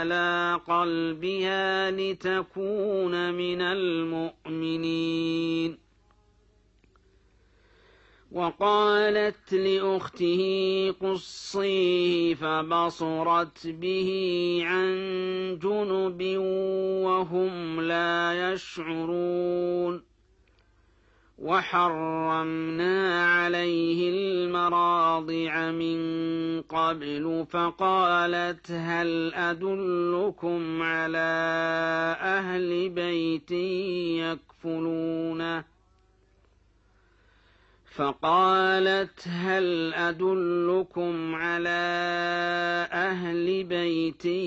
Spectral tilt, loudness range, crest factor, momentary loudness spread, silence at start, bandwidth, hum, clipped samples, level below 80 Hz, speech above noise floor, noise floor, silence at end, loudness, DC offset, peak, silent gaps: -6 dB/octave; 6 LU; 16 dB; 7 LU; 0 s; 8 kHz; none; under 0.1%; -66 dBFS; 36 dB; -63 dBFS; 0 s; -27 LUFS; under 0.1%; -12 dBFS; none